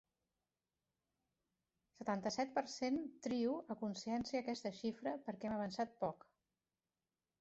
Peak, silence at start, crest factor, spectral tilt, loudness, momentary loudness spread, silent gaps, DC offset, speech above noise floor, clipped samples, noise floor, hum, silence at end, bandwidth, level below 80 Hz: -26 dBFS; 2 s; 18 dB; -4.5 dB/octave; -43 LUFS; 5 LU; none; under 0.1%; over 48 dB; under 0.1%; under -90 dBFS; none; 1.25 s; 8 kHz; -78 dBFS